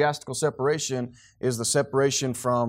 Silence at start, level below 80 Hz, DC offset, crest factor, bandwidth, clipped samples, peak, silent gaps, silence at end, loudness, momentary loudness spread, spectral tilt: 0 s; -64 dBFS; under 0.1%; 16 dB; 16 kHz; under 0.1%; -10 dBFS; none; 0 s; -25 LUFS; 7 LU; -4 dB/octave